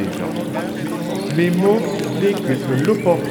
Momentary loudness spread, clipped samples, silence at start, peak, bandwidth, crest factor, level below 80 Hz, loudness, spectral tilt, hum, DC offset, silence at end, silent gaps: 8 LU; under 0.1%; 0 s; -4 dBFS; 20 kHz; 16 dB; -56 dBFS; -19 LUFS; -6.5 dB/octave; none; under 0.1%; 0 s; none